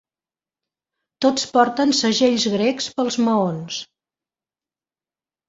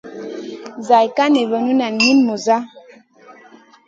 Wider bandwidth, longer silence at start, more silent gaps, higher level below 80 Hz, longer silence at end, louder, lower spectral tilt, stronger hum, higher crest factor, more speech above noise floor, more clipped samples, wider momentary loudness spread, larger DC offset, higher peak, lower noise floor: about the same, 8 kHz vs 7.8 kHz; first, 1.2 s vs 0.05 s; neither; first, -64 dBFS vs -70 dBFS; first, 1.65 s vs 0.55 s; second, -19 LUFS vs -15 LUFS; about the same, -4 dB/octave vs -3.5 dB/octave; neither; about the same, 20 dB vs 18 dB; first, over 71 dB vs 31 dB; neither; second, 8 LU vs 17 LU; neither; about the same, -2 dBFS vs 0 dBFS; first, under -90 dBFS vs -46 dBFS